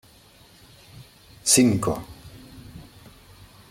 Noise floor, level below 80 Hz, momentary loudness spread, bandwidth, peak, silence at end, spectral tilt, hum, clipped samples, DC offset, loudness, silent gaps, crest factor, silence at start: -53 dBFS; -52 dBFS; 28 LU; 16.5 kHz; -4 dBFS; 0.9 s; -3.5 dB/octave; none; under 0.1%; under 0.1%; -20 LUFS; none; 24 dB; 1 s